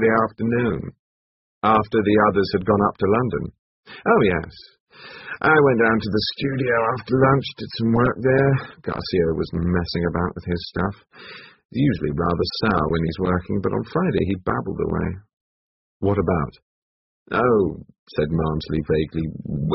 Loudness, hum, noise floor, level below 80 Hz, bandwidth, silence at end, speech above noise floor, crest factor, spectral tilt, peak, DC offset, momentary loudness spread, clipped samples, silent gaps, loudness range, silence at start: -21 LUFS; none; under -90 dBFS; -42 dBFS; 6 kHz; 0 s; over 69 dB; 18 dB; -5.5 dB/octave; -2 dBFS; under 0.1%; 12 LU; under 0.1%; 0.99-1.61 s, 3.59-3.83 s, 4.80-4.87 s, 11.65-11.69 s, 15.33-16.00 s, 16.62-17.26 s, 17.99-18.06 s; 5 LU; 0 s